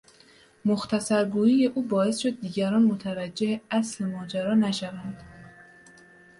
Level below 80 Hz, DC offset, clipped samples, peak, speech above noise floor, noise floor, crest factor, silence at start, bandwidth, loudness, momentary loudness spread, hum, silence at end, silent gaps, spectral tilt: -64 dBFS; under 0.1%; under 0.1%; -12 dBFS; 31 dB; -56 dBFS; 14 dB; 0.65 s; 11.5 kHz; -26 LUFS; 10 LU; none; 0.9 s; none; -5.5 dB/octave